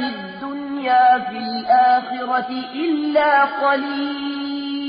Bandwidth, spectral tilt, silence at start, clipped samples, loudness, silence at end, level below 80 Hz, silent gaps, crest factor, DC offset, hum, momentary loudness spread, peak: 5.2 kHz; -1 dB/octave; 0 s; under 0.1%; -19 LUFS; 0 s; -62 dBFS; none; 14 dB; under 0.1%; none; 12 LU; -4 dBFS